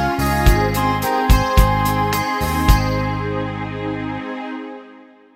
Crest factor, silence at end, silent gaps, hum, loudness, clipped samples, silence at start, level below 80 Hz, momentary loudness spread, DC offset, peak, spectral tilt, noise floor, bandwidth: 16 dB; 0.35 s; none; none; -18 LUFS; under 0.1%; 0 s; -22 dBFS; 12 LU; under 0.1%; 0 dBFS; -5.5 dB/octave; -44 dBFS; 16.5 kHz